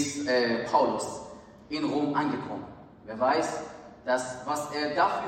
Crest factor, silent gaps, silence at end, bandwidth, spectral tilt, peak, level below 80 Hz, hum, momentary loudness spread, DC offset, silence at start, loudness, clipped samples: 18 dB; none; 0 s; 15.5 kHz; -4 dB/octave; -10 dBFS; -64 dBFS; none; 17 LU; under 0.1%; 0 s; -29 LUFS; under 0.1%